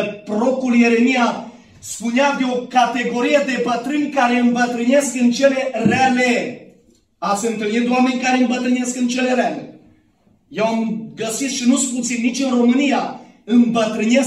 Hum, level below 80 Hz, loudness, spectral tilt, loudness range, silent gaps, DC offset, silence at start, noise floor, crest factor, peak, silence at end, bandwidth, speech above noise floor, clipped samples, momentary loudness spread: none; -62 dBFS; -17 LUFS; -4 dB/octave; 4 LU; none; under 0.1%; 0 s; -57 dBFS; 16 dB; -2 dBFS; 0 s; 13 kHz; 40 dB; under 0.1%; 10 LU